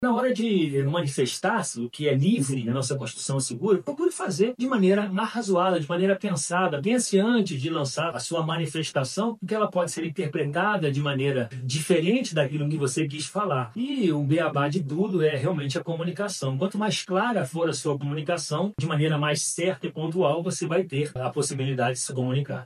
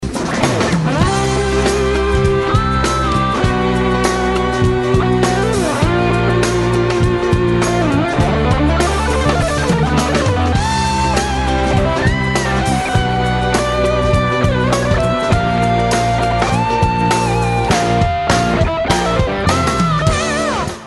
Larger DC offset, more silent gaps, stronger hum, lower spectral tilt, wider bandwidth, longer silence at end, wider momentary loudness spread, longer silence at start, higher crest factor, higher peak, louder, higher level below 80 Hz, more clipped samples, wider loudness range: second, under 0.1% vs 0.1%; neither; neither; about the same, -5 dB/octave vs -5.5 dB/octave; about the same, 13 kHz vs 12.5 kHz; about the same, 0 s vs 0 s; first, 6 LU vs 1 LU; about the same, 0 s vs 0 s; about the same, 16 dB vs 14 dB; second, -8 dBFS vs 0 dBFS; second, -26 LUFS vs -15 LUFS; second, -70 dBFS vs -24 dBFS; neither; about the same, 2 LU vs 1 LU